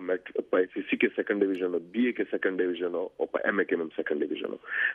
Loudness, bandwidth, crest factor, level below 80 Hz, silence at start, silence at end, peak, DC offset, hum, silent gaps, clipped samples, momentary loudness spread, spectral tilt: -29 LUFS; 4.1 kHz; 18 dB; -76 dBFS; 0 s; 0 s; -10 dBFS; under 0.1%; none; none; under 0.1%; 5 LU; -7.5 dB/octave